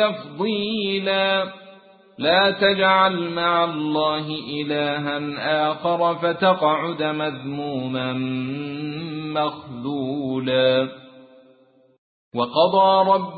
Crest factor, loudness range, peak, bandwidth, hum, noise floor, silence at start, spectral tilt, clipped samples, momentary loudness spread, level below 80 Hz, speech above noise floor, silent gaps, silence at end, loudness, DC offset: 18 dB; 6 LU; -4 dBFS; 4.8 kHz; none; -56 dBFS; 0 s; -10 dB/octave; under 0.1%; 12 LU; -62 dBFS; 35 dB; 11.98-12.31 s; 0 s; -21 LUFS; under 0.1%